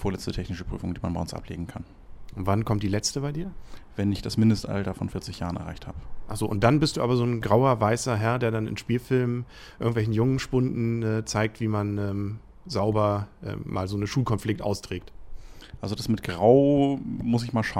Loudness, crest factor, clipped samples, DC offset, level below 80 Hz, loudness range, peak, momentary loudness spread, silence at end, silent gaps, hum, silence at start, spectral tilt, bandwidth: -26 LUFS; 20 dB; under 0.1%; under 0.1%; -44 dBFS; 5 LU; -6 dBFS; 14 LU; 0 s; none; none; 0 s; -6.5 dB/octave; 15 kHz